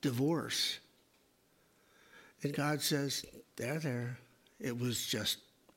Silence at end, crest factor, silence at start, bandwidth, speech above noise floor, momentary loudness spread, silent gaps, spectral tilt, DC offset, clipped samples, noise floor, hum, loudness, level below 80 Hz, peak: 0.35 s; 18 dB; 0.05 s; 16.5 kHz; 35 dB; 11 LU; none; -4 dB/octave; under 0.1%; under 0.1%; -71 dBFS; none; -36 LUFS; -74 dBFS; -20 dBFS